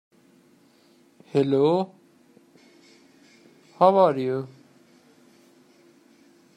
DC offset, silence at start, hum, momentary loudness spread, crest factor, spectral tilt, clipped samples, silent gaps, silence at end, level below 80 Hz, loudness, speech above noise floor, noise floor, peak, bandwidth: under 0.1%; 1.35 s; none; 15 LU; 22 dB; -8 dB/octave; under 0.1%; none; 2.1 s; -76 dBFS; -22 LUFS; 38 dB; -58 dBFS; -4 dBFS; 10 kHz